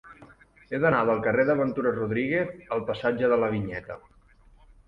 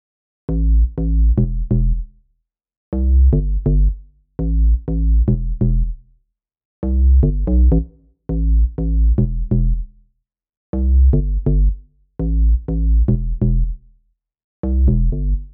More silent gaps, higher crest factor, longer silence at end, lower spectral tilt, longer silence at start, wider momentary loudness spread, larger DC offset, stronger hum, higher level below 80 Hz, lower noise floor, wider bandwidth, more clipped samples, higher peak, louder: second, none vs 2.77-2.92 s, 6.65-6.82 s, 10.57-10.73 s, 14.44-14.63 s; first, 18 dB vs 12 dB; first, 0.9 s vs 0.05 s; second, -9 dB/octave vs -15 dB/octave; second, 0.05 s vs 0.5 s; about the same, 12 LU vs 13 LU; neither; neither; second, -56 dBFS vs -16 dBFS; second, -56 dBFS vs -69 dBFS; first, 5.8 kHz vs 1.3 kHz; neither; about the same, -8 dBFS vs -6 dBFS; second, -26 LUFS vs -19 LUFS